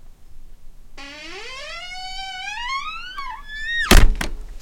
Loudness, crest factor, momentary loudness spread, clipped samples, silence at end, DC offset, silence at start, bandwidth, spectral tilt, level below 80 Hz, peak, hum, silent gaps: -23 LUFS; 20 dB; 19 LU; under 0.1%; 0 s; under 0.1%; 0.05 s; 17 kHz; -3.5 dB/octave; -24 dBFS; 0 dBFS; none; none